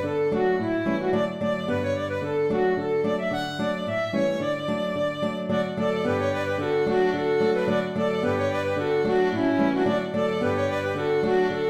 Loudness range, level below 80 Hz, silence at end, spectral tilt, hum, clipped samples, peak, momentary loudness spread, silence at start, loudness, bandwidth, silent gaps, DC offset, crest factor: 2 LU; -56 dBFS; 0 s; -6.5 dB/octave; none; under 0.1%; -12 dBFS; 4 LU; 0 s; -25 LUFS; 13.5 kHz; none; under 0.1%; 14 dB